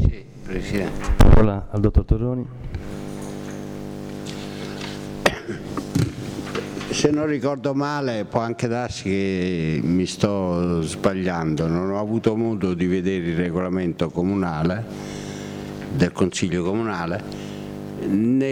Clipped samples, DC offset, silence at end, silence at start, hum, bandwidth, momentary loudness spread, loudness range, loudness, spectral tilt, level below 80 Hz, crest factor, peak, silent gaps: under 0.1%; under 0.1%; 0 s; 0 s; none; 15.5 kHz; 12 LU; 6 LU; -24 LUFS; -6.5 dB/octave; -28 dBFS; 16 dB; -6 dBFS; none